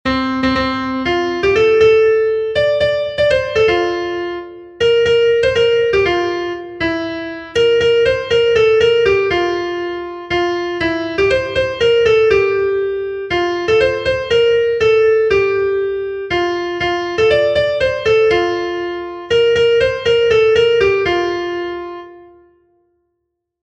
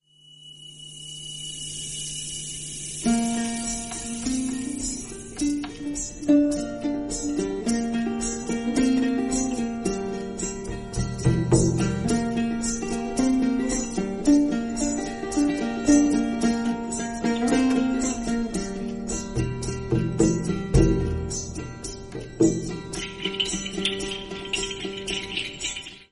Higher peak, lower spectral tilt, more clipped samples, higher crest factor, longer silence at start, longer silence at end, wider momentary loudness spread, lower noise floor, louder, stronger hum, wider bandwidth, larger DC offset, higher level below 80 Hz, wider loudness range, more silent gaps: first, 0 dBFS vs -6 dBFS; about the same, -5 dB/octave vs -4.5 dB/octave; neither; second, 14 dB vs 20 dB; second, 0.05 s vs 0.3 s; first, 1.4 s vs 0.1 s; about the same, 10 LU vs 11 LU; first, -73 dBFS vs -50 dBFS; first, -15 LUFS vs -25 LUFS; neither; second, 8.4 kHz vs 11.5 kHz; neither; about the same, -40 dBFS vs -38 dBFS; second, 2 LU vs 5 LU; neither